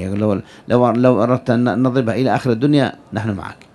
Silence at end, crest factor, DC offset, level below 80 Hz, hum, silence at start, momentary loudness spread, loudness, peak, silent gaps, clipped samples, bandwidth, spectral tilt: 0.2 s; 16 dB; under 0.1%; -52 dBFS; none; 0 s; 10 LU; -17 LUFS; 0 dBFS; none; under 0.1%; 11 kHz; -8 dB/octave